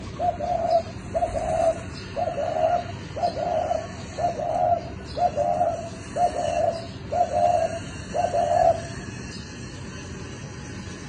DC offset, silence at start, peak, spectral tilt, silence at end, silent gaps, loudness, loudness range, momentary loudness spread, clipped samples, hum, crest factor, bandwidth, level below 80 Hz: under 0.1%; 0 s; -8 dBFS; -5.5 dB/octave; 0 s; none; -25 LUFS; 2 LU; 14 LU; under 0.1%; none; 18 dB; 10 kHz; -46 dBFS